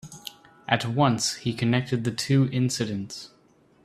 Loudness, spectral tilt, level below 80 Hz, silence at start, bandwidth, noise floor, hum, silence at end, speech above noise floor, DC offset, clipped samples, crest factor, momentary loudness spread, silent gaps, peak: -25 LUFS; -5 dB/octave; -60 dBFS; 0.05 s; 14 kHz; -59 dBFS; none; 0.55 s; 35 dB; under 0.1%; under 0.1%; 24 dB; 18 LU; none; -2 dBFS